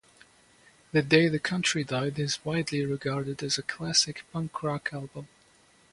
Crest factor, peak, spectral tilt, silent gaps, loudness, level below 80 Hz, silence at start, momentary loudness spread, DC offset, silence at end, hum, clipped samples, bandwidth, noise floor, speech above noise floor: 26 dB; -4 dBFS; -4 dB/octave; none; -28 LUFS; -64 dBFS; 0.95 s; 12 LU; under 0.1%; 0.65 s; none; under 0.1%; 11.5 kHz; -61 dBFS; 33 dB